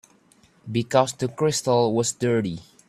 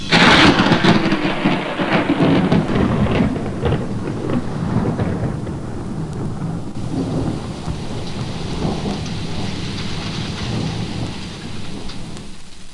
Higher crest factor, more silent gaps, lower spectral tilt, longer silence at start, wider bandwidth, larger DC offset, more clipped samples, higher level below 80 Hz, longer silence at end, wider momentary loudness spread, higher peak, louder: about the same, 20 dB vs 16 dB; neither; about the same, -5 dB/octave vs -5.5 dB/octave; first, 0.65 s vs 0 s; first, 14 kHz vs 11.5 kHz; neither; neither; second, -62 dBFS vs -34 dBFS; first, 0.25 s vs 0 s; second, 8 LU vs 15 LU; about the same, -4 dBFS vs -2 dBFS; second, -23 LUFS vs -19 LUFS